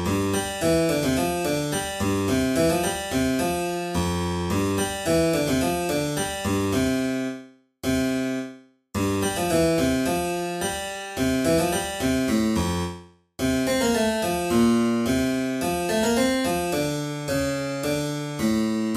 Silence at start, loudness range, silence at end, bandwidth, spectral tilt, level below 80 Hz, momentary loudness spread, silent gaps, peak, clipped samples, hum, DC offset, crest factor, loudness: 0 s; 2 LU; 0 s; 15.5 kHz; -4.5 dB/octave; -44 dBFS; 6 LU; none; -8 dBFS; under 0.1%; none; under 0.1%; 14 dB; -24 LUFS